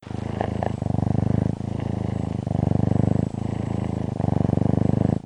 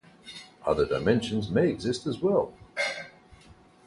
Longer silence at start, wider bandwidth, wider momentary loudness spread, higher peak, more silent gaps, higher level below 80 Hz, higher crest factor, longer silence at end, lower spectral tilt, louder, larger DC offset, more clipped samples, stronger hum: second, 0 s vs 0.25 s; second, 9.8 kHz vs 11.5 kHz; second, 6 LU vs 18 LU; first, -6 dBFS vs -10 dBFS; neither; first, -38 dBFS vs -52 dBFS; about the same, 18 dB vs 20 dB; second, 0.05 s vs 0.5 s; first, -9.5 dB/octave vs -6 dB/octave; first, -24 LUFS vs -28 LUFS; neither; neither; neither